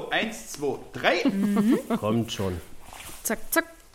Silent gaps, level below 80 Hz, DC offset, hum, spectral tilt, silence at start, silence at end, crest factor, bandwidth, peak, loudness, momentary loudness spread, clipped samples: none; -50 dBFS; under 0.1%; none; -4.5 dB/octave; 0 s; 0.15 s; 22 dB; 16.5 kHz; -6 dBFS; -26 LUFS; 13 LU; under 0.1%